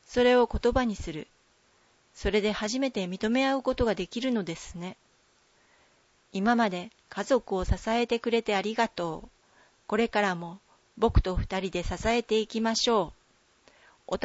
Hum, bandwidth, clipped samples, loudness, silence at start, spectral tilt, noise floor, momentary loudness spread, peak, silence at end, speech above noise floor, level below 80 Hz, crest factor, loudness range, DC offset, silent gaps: none; 8 kHz; under 0.1%; -28 LUFS; 0.1 s; -5 dB/octave; -65 dBFS; 13 LU; -10 dBFS; 0 s; 38 dB; -40 dBFS; 18 dB; 3 LU; under 0.1%; none